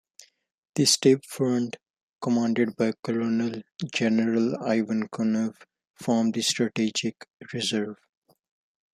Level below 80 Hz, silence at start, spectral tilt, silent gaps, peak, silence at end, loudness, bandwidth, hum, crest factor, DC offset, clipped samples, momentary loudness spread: -72 dBFS; 0.75 s; -4 dB/octave; 1.90-1.94 s, 2.03-2.19 s, 2.99-3.03 s, 5.90-5.94 s, 7.33-7.38 s; -6 dBFS; 1 s; -26 LUFS; 14 kHz; none; 20 dB; under 0.1%; under 0.1%; 12 LU